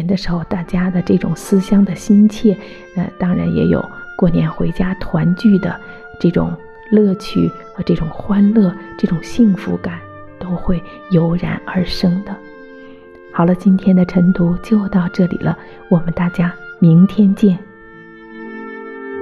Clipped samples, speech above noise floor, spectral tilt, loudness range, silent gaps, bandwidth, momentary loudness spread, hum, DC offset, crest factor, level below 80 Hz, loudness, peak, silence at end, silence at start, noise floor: under 0.1%; 24 dB; -8 dB/octave; 3 LU; none; 11.5 kHz; 15 LU; none; under 0.1%; 14 dB; -34 dBFS; -15 LUFS; -2 dBFS; 0 s; 0 s; -38 dBFS